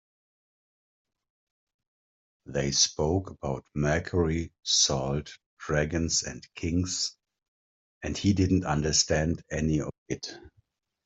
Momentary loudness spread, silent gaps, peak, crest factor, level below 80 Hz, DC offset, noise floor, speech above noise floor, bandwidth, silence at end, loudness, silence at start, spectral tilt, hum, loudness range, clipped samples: 13 LU; 5.46-5.57 s, 7.48-8.01 s, 9.98-10.06 s; -8 dBFS; 22 dB; -48 dBFS; under 0.1%; -70 dBFS; 42 dB; 8.2 kHz; 0.55 s; -27 LUFS; 2.45 s; -3.5 dB/octave; none; 4 LU; under 0.1%